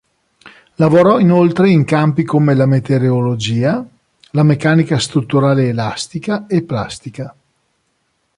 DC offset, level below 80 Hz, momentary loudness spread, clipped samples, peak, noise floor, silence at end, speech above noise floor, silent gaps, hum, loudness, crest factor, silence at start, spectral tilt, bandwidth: under 0.1%; -50 dBFS; 12 LU; under 0.1%; -2 dBFS; -65 dBFS; 1.05 s; 52 dB; none; none; -14 LUFS; 12 dB; 0.45 s; -7 dB/octave; 11 kHz